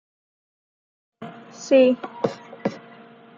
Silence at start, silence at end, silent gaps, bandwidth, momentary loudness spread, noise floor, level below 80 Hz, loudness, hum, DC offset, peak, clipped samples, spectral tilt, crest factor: 1.2 s; 0.6 s; none; 7.4 kHz; 24 LU; -47 dBFS; -72 dBFS; -22 LUFS; none; under 0.1%; -6 dBFS; under 0.1%; -5.5 dB/octave; 20 dB